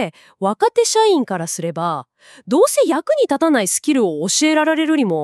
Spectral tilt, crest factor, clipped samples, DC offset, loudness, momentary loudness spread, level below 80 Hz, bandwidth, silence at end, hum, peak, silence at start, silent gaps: -3.5 dB/octave; 14 dB; under 0.1%; under 0.1%; -17 LUFS; 9 LU; -76 dBFS; 13.5 kHz; 0 s; none; -2 dBFS; 0 s; none